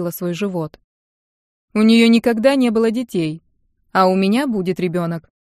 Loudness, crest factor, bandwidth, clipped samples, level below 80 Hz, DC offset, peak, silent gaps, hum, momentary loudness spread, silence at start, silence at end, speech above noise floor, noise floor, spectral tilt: -17 LUFS; 16 dB; 14.5 kHz; under 0.1%; -58 dBFS; under 0.1%; 0 dBFS; 0.84-1.68 s; none; 13 LU; 0 s; 0.35 s; 46 dB; -62 dBFS; -6 dB/octave